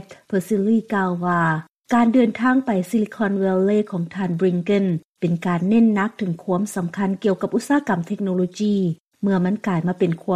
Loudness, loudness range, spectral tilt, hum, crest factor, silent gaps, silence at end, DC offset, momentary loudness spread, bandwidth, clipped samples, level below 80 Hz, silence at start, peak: -21 LUFS; 2 LU; -7.5 dB/octave; none; 14 dB; 1.71-1.75 s, 5.05-5.15 s, 9.00-9.10 s; 0 s; under 0.1%; 8 LU; 14.5 kHz; under 0.1%; -62 dBFS; 0 s; -6 dBFS